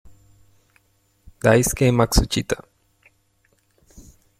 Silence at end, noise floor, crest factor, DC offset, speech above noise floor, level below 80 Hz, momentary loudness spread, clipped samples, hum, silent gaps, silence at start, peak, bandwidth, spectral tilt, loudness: 0.4 s; -64 dBFS; 22 dB; under 0.1%; 46 dB; -34 dBFS; 10 LU; under 0.1%; none; none; 1.45 s; -2 dBFS; 16.5 kHz; -5 dB/octave; -19 LUFS